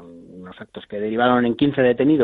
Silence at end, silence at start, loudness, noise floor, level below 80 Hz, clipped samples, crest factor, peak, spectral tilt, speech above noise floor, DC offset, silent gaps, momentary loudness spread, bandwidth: 0 s; 0 s; -19 LUFS; -40 dBFS; -54 dBFS; under 0.1%; 16 dB; -4 dBFS; -9.5 dB/octave; 21 dB; under 0.1%; none; 22 LU; 4.3 kHz